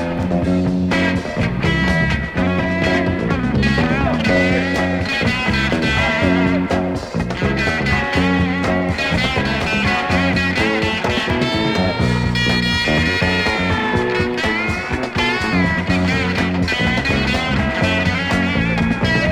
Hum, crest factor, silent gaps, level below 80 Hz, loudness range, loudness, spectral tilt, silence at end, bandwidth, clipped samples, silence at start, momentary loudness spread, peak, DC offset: none; 14 dB; none; -30 dBFS; 1 LU; -17 LUFS; -6 dB/octave; 0 s; 14 kHz; under 0.1%; 0 s; 3 LU; -4 dBFS; under 0.1%